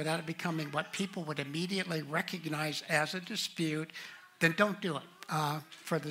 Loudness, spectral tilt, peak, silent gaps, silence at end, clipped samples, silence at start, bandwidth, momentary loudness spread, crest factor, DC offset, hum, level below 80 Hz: -34 LUFS; -4.5 dB/octave; -12 dBFS; none; 0 s; under 0.1%; 0 s; 16 kHz; 7 LU; 24 dB; under 0.1%; none; -80 dBFS